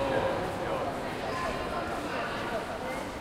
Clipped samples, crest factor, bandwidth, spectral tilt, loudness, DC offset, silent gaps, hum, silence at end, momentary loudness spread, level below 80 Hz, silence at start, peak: under 0.1%; 16 dB; 16 kHz; -5 dB/octave; -33 LUFS; under 0.1%; none; none; 0 s; 4 LU; -50 dBFS; 0 s; -16 dBFS